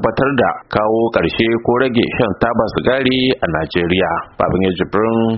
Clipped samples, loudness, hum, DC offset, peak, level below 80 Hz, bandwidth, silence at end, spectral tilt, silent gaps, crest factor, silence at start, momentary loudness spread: under 0.1%; -16 LUFS; none; under 0.1%; 0 dBFS; -40 dBFS; 5.8 kHz; 0 s; -4.5 dB/octave; none; 16 dB; 0 s; 3 LU